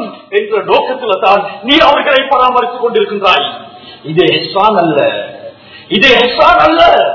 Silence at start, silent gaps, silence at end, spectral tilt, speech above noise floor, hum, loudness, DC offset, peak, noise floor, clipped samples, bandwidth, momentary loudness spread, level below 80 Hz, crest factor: 0 s; none; 0 s; -5 dB/octave; 22 dB; none; -9 LUFS; under 0.1%; 0 dBFS; -31 dBFS; 1%; 6 kHz; 10 LU; -42 dBFS; 10 dB